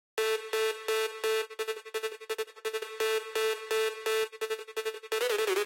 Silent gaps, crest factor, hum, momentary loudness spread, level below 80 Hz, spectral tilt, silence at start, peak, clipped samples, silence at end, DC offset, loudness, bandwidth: none; 14 dB; none; 6 LU; -80 dBFS; 0.5 dB/octave; 0.15 s; -18 dBFS; under 0.1%; 0 s; under 0.1%; -32 LUFS; 17 kHz